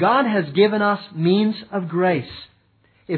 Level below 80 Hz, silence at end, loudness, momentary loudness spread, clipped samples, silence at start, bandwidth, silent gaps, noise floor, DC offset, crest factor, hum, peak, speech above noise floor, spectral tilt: -62 dBFS; 0 s; -20 LUFS; 9 LU; under 0.1%; 0 s; 4.6 kHz; none; -59 dBFS; under 0.1%; 16 dB; none; -4 dBFS; 40 dB; -10 dB/octave